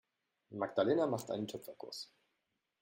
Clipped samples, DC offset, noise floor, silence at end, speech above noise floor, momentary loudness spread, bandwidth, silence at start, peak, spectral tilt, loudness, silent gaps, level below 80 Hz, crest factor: under 0.1%; under 0.1%; -85 dBFS; 0.75 s; 48 dB; 16 LU; 16 kHz; 0.5 s; -18 dBFS; -5.5 dB/octave; -37 LUFS; none; -80 dBFS; 20 dB